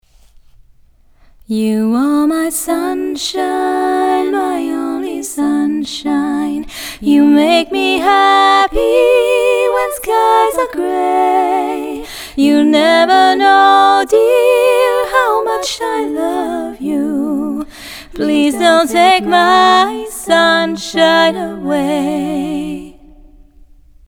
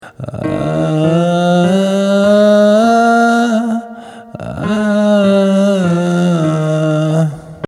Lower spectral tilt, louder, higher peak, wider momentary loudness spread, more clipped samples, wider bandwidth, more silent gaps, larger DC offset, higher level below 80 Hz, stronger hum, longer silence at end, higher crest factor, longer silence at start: second, -3.5 dB/octave vs -7 dB/octave; about the same, -12 LUFS vs -12 LUFS; about the same, 0 dBFS vs 0 dBFS; about the same, 11 LU vs 12 LU; neither; first, 19.5 kHz vs 13 kHz; neither; neither; first, -42 dBFS vs -48 dBFS; neither; first, 1.15 s vs 0 s; about the same, 12 dB vs 12 dB; first, 1.5 s vs 0.05 s